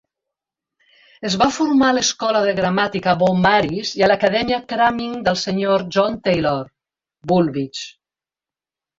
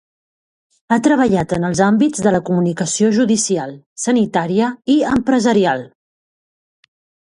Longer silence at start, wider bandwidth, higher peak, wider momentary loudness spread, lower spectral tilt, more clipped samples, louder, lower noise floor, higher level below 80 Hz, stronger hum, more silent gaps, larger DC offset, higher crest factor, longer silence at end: first, 1.2 s vs 0.9 s; second, 7.8 kHz vs 11.5 kHz; about the same, -2 dBFS vs 0 dBFS; first, 11 LU vs 5 LU; about the same, -4.5 dB/octave vs -5 dB/octave; neither; about the same, -18 LUFS vs -16 LUFS; about the same, under -90 dBFS vs under -90 dBFS; about the same, -50 dBFS vs -50 dBFS; neither; second, none vs 3.86-3.96 s; neither; about the same, 18 dB vs 16 dB; second, 1.1 s vs 1.4 s